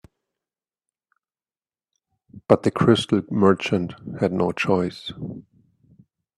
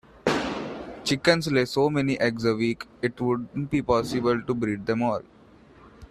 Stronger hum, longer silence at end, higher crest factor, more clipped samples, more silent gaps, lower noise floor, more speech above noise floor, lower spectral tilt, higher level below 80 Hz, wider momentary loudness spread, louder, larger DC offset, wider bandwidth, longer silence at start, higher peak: neither; first, 0.95 s vs 0.05 s; about the same, 24 dB vs 20 dB; neither; neither; first, under -90 dBFS vs -52 dBFS; first, over 69 dB vs 27 dB; about the same, -6.5 dB/octave vs -5.5 dB/octave; second, -60 dBFS vs -54 dBFS; first, 17 LU vs 9 LU; first, -21 LUFS vs -25 LUFS; neither; second, 12 kHz vs 14 kHz; first, 2.35 s vs 0.25 s; first, -2 dBFS vs -6 dBFS